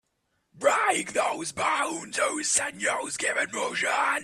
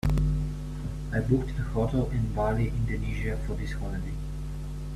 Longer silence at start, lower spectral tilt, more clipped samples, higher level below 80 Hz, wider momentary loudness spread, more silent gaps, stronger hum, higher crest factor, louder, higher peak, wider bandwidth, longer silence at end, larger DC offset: first, 0.55 s vs 0.05 s; second, -1 dB/octave vs -8 dB/octave; neither; second, -68 dBFS vs -32 dBFS; second, 5 LU vs 9 LU; neither; neither; about the same, 18 dB vs 16 dB; first, -26 LUFS vs -30 LUFS; first, -8 dBFS vs -12 dBFS; about the same, 14 kHz vs 13 kHz; about the same, 0 s vs 0 s; neither